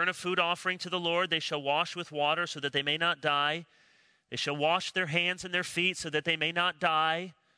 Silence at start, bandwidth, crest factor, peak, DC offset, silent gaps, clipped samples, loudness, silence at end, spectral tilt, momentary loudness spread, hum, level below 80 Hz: 0 s; 11 kHz; 20 dB; -12 dBFS; under 0.1%; none; under 0.1%; -29 LUFS; 0.25 s; -3 dB/octave; 4 LU; none; -74 dBFS